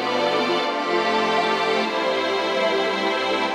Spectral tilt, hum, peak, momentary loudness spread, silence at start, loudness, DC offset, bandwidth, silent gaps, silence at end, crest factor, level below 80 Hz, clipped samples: -3.5 dB/octave; none; -8 dBFS; 2 LU; 0 s; -21 LUFS; under 0.1%; 14.5 kHz; none; 0 s; 14 dB; -76 dBFS; under 0.1%